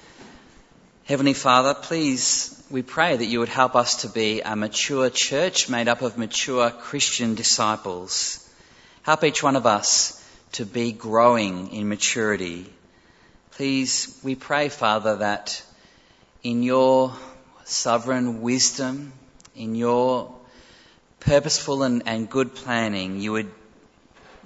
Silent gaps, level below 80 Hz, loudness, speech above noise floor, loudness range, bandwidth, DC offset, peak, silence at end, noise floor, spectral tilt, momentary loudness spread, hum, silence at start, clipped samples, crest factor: none; -56 dBFS; -22 LUFS; 33 dB; 4 LU; 8.2 kHz; under 0.1%; -2 dBFS; 0.9 s; -55 dBFS; -3 dB/octave; 11 LU; none; 0.2 s; under 0.1%; 20 dB